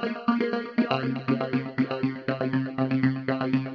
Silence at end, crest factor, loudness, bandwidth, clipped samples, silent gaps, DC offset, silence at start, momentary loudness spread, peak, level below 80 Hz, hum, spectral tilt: 0 s; 18 dB; -27 LUFS; 6 kHz; under 0.1%; none; under 0.1%; 0 s; 3 LU; -8 dBFS; -70 dBFS; none; -9 dB/octave